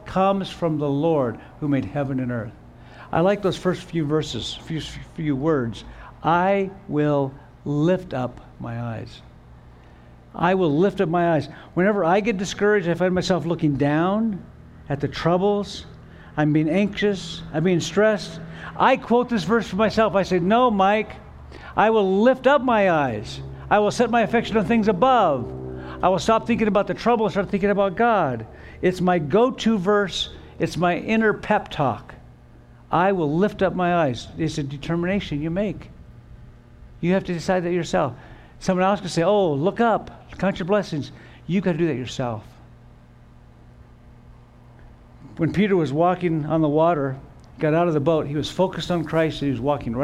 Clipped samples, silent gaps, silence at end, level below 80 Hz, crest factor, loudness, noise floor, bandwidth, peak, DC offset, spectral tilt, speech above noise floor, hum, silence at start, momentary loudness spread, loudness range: under 0.1%; none; 0 s; -48 dBFS; 18 dB; -22 LUFS; -48 dBFS; 12 kHz; -4 dBFS; under 0.1%; -6.5 dB/octave; 27 dB; none; 0 s; 12 LU; 6 LU